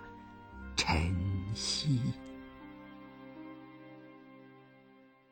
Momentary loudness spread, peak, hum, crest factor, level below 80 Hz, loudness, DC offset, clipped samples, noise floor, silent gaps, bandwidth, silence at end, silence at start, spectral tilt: 23 LU; -14 dBFS; none; 24 dB; -50 dBFS; -33 LUFS; under 0.1%; under 0.1%; -61 dBFS; none; 16.5 kHz; 0.25 s; 0 s; -4.5 dB/octave